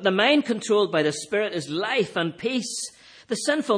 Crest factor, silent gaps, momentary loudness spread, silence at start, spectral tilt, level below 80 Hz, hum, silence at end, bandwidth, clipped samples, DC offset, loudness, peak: 16 dB; none; 10 LU; 0 s; -3.5 dB/octave; -72 dBFS; none; 0 s; 10.5 kHz; under 0.1%; under 0.1%; -24 LUFS; -8 dBFS